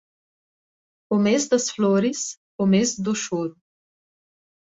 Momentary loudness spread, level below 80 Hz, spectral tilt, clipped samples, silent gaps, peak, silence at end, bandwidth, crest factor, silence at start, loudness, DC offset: 9 LU; -66 dBFS; -4.5 dB/octave; under 0.1%; 2.37-2.59 s; -8 dBFS; 1.15 s; 8 kHz; 18 dB; 1.1 s; -22 LUFS; under 0.1%